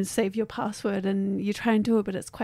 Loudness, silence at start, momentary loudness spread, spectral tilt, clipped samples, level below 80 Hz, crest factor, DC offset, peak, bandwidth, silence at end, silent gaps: -27 LUFS; 0 s; 7 LU; -5.5 dB/octave; under 0.1%; -60 dBFS; 16 dB; under 0.1%; -10 dBFS; 15 kHz; 0 s; none